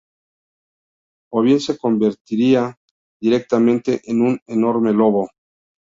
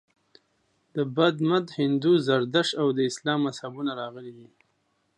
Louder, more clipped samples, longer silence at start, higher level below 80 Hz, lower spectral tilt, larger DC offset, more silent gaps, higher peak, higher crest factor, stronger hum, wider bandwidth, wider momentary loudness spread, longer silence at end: first, -18 LUFS vs -25 LUFS; neither; first, 1.3 s vs 0.95 s; first, -62 dBFS vs -76 dBFS; first, -7 dB/octave vs -5.5 dB/octave; neither; first, 2.21-2.25 s, 2.77-3.20 s, 4.42-4.46 s vs none; first, -2 dBFS vs -6 dBFS; about the same, 16 dB vs 20 dB; neither; second, 7.6 kHz vs 11 kHz; second, 6 LU vs 14 LU; second, 0.6 s vs 0.75 s